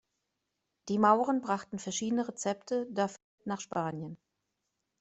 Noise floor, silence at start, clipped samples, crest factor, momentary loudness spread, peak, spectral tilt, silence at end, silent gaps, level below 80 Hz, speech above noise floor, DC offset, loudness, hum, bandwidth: -84 dBFS; 0.85 s; under 0.1%; 22 dB; 15 LU; -12 dBFS; -5 dB/octave; 0.85 s; 3.24-3.38 s; -76 dBFS; 53 dB; under 0.1%; -32 LUFS; none; 8.2 kHz